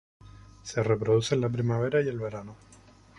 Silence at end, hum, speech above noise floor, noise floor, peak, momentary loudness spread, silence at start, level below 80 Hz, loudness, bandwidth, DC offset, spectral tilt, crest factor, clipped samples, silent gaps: 0.65 s; none; 28 dB; -55 dBFS; -10 dBFS; 17 LU; 0.65 s; -56 dBFS; -28 LUFS; 11.5 kHz; under 0.1%; -6.5 dB/octave; 18 dB; under 0.1%; none